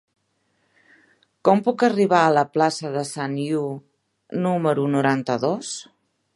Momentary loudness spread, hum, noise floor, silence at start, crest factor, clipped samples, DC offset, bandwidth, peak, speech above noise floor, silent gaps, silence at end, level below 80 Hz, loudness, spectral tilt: 13 LU; none; -69 dBFS; 1.45 s; 20 dB; under 0.1%; under 0.1%; 11.5 kHz; -2 dBFS; 48 dB; none; 0.55 s; -72 dBFS; -21 LUFS; -5.5 dB/octave